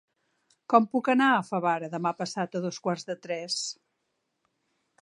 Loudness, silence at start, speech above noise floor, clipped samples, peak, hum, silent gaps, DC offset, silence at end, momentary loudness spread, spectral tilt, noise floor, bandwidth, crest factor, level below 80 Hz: -27 LUFS; 0.7 s; 52 dB; under 0.1%; -6 dBFS; none; none; under 0.1%; 1.3 s; 11 LU; -4.5 dB/octave; -79 dBFS; 11 kHz; 22 dB; -82 dBFS